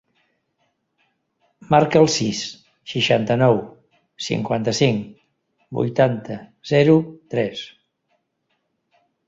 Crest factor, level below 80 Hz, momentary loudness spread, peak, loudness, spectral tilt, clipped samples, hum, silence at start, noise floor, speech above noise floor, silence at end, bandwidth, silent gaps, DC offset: 20 dB; -58 dBFS; 18 LU; -2 dBFS; -19 LUFS; -5.5 dB/octave; under 0.1%; none; 1.7 s; -72 dBFS; 53 dB; 1.6 s; 7.8 kHz; none; under 0.1%